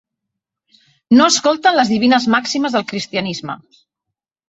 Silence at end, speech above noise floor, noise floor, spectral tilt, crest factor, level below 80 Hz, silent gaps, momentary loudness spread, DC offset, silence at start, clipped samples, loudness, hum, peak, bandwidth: 0.95 s; 66 dB; -81 dBFS; -3.5 dB/octave; 16 dB; -58 dBFS; none; 13 LU; under 0.1%; 1.1 s; under 0.1%; -15 LUFS; none; -2 dBFS; 8.4 kHz